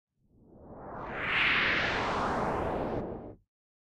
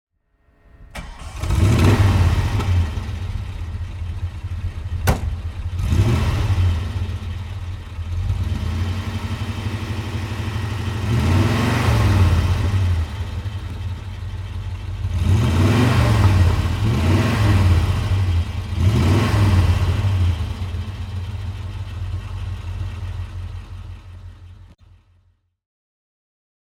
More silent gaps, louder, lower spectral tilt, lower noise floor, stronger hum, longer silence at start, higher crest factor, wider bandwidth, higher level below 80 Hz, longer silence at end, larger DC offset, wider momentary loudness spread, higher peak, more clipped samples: neither; second, -29 LUFS vs -21 LUFS; second, -5 dB/octave vs -6.5 dB/octave; about the same, -60 dBFS vs -60 dBFS; neither; second, 0.5 s vs 0.8 s; about the same, 16 dB vs 18 dB; about the same, 13.5 kHz vs 14.5 kHz; second, -50 dBFS vs -28 dBFS; second, 0.65 s vs 2.1 s; neither; first, 20 LU vs 14 LU; second, -16 dBFS vs -2 dBFS; neither